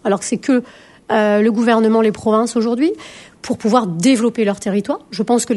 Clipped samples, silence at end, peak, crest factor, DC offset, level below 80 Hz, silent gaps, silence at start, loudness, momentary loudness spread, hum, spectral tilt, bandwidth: under 0.1%; 0 s; 0 dBFS; 16 dB; under 0.1%; -58 dBFS; none; 0.05 s; -16 LUFS; 8 LU; none; -5 dB/octave; 11.5 kHz